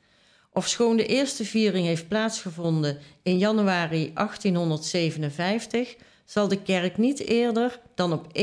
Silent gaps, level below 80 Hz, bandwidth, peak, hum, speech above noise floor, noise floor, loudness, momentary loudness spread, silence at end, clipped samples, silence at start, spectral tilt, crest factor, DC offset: none; -66 dBFS; 11 kHz; -10 dBFS; none; 36 dB; -61 dBFS; -25 LUFS; 7 LU; 0 s; under 0.1%; 0.55 s; -5 dB/octave; 14 dB; under 0.1%